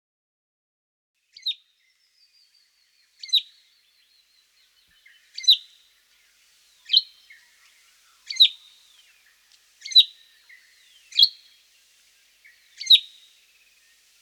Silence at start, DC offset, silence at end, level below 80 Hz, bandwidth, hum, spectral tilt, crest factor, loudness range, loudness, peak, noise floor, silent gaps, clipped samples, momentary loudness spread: 1.45 s; under 0.1%; 1.2 s; -86 dBFS; 19.5 kHz; none; 7 dB/octave; 22 dB; 9 LU; -18 LUFS; -4 dBFS; -66 dBFS; none; under 0.1%; 21 LU